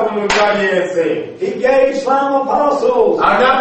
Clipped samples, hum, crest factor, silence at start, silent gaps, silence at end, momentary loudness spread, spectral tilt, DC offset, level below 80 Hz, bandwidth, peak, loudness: under 0.1%; none; 14 dB; 0 s; none; 0 s; 5 LU; -4.5 dB/octave; under 0.1%; -46 dBFS; 8.6 kHz; 0 dBFS; -14 LUFS